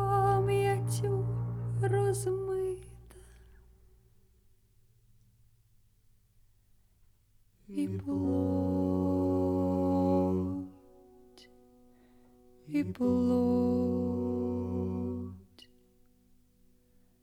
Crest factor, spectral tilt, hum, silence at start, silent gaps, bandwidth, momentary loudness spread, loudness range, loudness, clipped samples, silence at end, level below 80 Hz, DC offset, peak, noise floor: 16 dB; -8 dB/octave; 50 Hz at -65 dBFS; 0 s; none; 15.5 kHz; 10 LU; 9 LU; -31 LUFS; under 0.1%; 1.8 s; -58 dBFS; under 0.1%; -16 dBFS; -65 dBFS